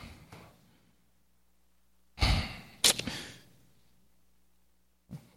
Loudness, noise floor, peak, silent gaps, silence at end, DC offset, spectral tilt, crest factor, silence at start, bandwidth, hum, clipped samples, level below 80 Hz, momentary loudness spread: -29 LUFS; -73 dBFS; -4 dBFS; none; 0.2 s; under 0.1%; -2 dB/octave; 32 dB; 0 s; 16.5 kHz; none; under 0.1%; -44 dBFS; 25 LU